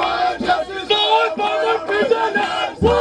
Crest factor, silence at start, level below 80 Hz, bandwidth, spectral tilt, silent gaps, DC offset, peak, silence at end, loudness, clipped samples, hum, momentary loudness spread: 16 dB; 0 s; -40 dBFS; 10.5 kHz; -4.5 dB/octave; none; under 0.1%; -2 dBFS; 0 s; -18 LUFS; under 0.1%; none; 5 LU